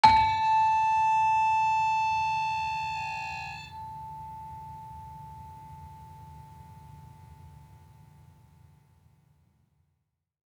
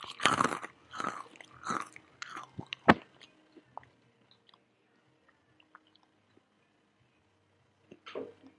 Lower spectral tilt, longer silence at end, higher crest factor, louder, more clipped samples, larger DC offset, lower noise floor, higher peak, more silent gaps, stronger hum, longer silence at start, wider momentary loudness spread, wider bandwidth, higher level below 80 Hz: about the same, -3 dB/octave vs -4 dB/octave; first, 3 s vs 0.3 s; second, 24 dB vs 38 dB; first, -26 LUFS vs -33 LUFS; neither; neither; first, -79 dBFS vs -71 dBFS; second, -6 dBFS vs 0 dBFS; neither; neither; about the same, 0.05 s vs 0 s; about the same, 25 LU vs 26 LU; second, 10 kHz vs 11.5 kHz; first, -56 dBFS vs -68 dBFS